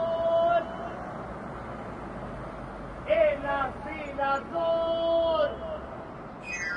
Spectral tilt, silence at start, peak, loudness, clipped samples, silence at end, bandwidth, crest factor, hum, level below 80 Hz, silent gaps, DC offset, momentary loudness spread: -5 dB/octave; 0 s; -12 dBFS; -29 LUFS; under 0.1%; 0 s; 9.6 kHz; 18 dB; none; -50 dBFS; none; under 0.1%; 14 LU